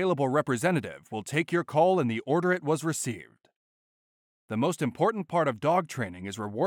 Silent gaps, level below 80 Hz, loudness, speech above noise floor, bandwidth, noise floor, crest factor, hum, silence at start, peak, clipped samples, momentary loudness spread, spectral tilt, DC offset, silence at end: 3.56-4.48 s; -74 dBFS; -28 LUFS; over 63 dB; 18 kHz; under -90 dBFS; 16 dB; none; 0 s; -12 dBFS; under 0.1%; 11 LU; -5.5 dB/octave; under 0.1%; 0 s